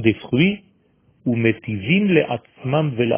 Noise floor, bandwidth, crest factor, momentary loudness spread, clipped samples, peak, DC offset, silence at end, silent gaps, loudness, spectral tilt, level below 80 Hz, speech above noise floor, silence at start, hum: -59 dBFS; 3.6 kHz; 20 dB; 10 LU; under 0.1%; 0 dBFS; under 0.1%; 0 s; none; -20 LUFS; -11 dB/octave; -52 dBFS; 40 dB; 0 s; none